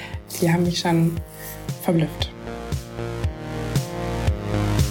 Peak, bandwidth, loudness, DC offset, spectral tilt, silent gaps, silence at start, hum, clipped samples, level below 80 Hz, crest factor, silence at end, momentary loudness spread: -6 dBFS; 17 kHz; -24 LUFS; under 0.1%; -6 dB/octave; none; 0 s; none; under 0.1%; -34 dBFS; 18 dB; 0 s; 11 LU